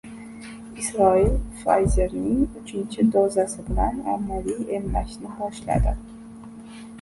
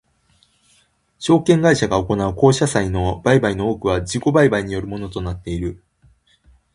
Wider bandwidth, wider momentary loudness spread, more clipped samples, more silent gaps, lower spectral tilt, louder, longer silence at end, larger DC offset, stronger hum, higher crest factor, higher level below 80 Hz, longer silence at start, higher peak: about the same, 11.5 kHz vs 11.5 kHz; first, 21 LU vs 12 LU; neither; neither; about the same, -6.5 dB/octave vs -6 dB/octave; second, -24 LUFS vs -18 LUFS; second, 0 s vs 1 s; neither; neither; about the same, 18 dB vs 18 dB; first, -32 dBFS vs -38 dBFS; second, 0.05 s vs 1.2 s; second, -6 dBFS vs 0 dBFS